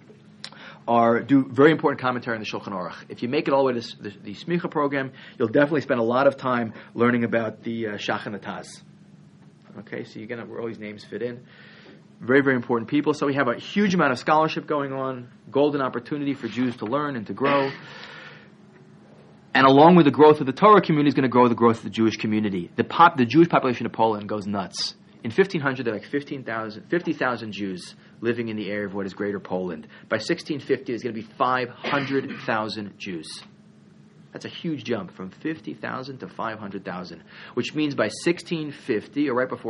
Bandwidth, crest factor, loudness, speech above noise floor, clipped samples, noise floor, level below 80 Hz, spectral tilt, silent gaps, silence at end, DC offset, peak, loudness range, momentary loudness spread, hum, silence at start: 11 kHz; 22 dB; -23 LUFS; 28 dB; under 0.1%; -51 dBFS; -68 dBFS; -6.5 dB/octave; none; 0 s; under 0.1%; -2 dBFS; 14 LU; 18 LU; none; 0.1 s